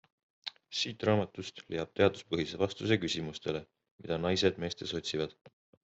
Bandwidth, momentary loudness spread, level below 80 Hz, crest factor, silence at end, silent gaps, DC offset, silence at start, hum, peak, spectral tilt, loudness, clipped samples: 8.2 kHz; 11 LU; -66 dBFS; 24 dB; 0.35 s; 3.91-3.98 s, 5.41-5.45 s; under 0.1%; 0.45 s; none; -10 dBFS; -5 dB/octave; -33 LUFS; under 0.1%